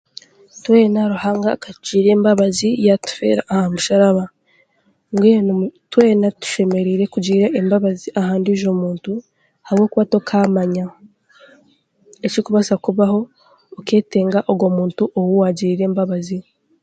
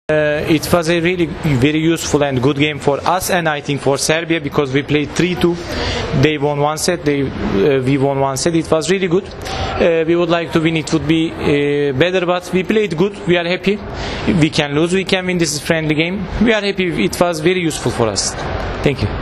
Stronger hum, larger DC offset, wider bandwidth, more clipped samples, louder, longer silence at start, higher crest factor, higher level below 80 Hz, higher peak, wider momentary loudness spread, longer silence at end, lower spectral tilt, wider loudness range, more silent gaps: neither; neither; second, 9.2 kHz vs 14 kHz; neither; about the same, -17 LUFS vs -16 LUFS; first, 0.55 s vs 0.1 s; about the same, 16 dB vs 16 dB; second, -60 dBFS vs -36 dBFS; about the same, 0 dBFS vs 0 dBFS; first, 10 LU vs 4 LU; first, 0.4 s vs 0 s; first, -6.5 dB/octave vs -5 dB/octave; first, 4 LU vs 1 LU; neither